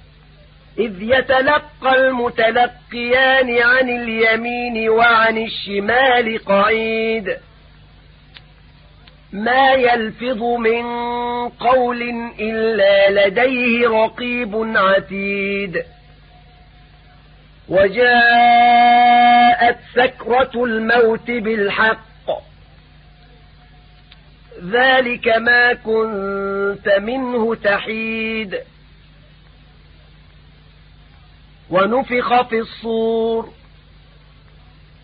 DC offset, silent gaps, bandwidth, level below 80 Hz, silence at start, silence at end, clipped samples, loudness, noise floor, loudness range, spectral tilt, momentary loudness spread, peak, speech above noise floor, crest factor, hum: under 0.1%; none; 5 kHz; -48 dBFS; 0.75 s; 1.55 s; under 0.1%; -15 LUFS; -45 dBFS; 9 LU; -9.5 dB/octave; 12 LU; -2 dBFS; 30 dB; 16 dB; none